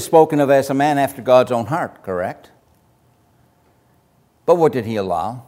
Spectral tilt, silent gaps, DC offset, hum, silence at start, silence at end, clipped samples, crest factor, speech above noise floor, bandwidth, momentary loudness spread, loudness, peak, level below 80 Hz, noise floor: -6 dB/octave; none; under 0.1%; none; 0 s; 0.05 s; under 0.1%; 18 dB; 41 dB; 16 kHz; 11 LU; -17 LUFS; 0 dBFS; -60 dBFS; -58 dBFS